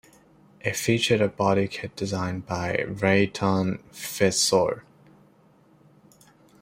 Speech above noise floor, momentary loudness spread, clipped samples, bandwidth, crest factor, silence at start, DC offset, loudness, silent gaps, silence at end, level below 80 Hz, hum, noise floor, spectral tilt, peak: 34 dB; 10 LU; under 0.1%; 16 kHz; 20 dB; 0.65 s; under 0.1%; -24 LUFS; none; 1.8 s; -58 dBFS; none; -58 dBFS; -4.5 dB/octave; -6 dBFS